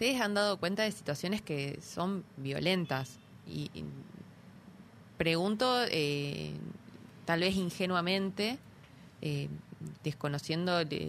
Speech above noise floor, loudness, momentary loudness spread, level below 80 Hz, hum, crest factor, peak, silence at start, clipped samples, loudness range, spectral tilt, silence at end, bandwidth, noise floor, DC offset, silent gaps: 22 dB; -33 LUFS; 17 LU; -64 dBFS; none; 20 dB; -16 dBFS; 0 s; under 0.1%; 5 LU; -5 dB/octave; 0 s; 15.5 kHz; -55 dBFS; under 0.1%; none